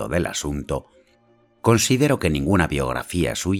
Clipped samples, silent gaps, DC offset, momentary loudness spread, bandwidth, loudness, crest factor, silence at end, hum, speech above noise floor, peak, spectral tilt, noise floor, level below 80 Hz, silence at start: under 0.1%; none; under 0.1%; 10 LU; 17.5 kHz; -21 LUFS; 18 dB; 0 s; none; 38 dB; -4 dBFS; -5 dB/octave; -58 dBFS; -38 dBFS; 0 s